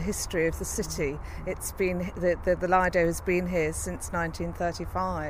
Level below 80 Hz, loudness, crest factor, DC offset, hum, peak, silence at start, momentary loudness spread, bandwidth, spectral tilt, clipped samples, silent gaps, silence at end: -40 dBFS; -28 LUFS; 18 dB; under 0.1%; none; -10 dBFS; 0 s; 9 LU; 16.5 kHz; -5 dB/octave; under 0.1%; none; 0 s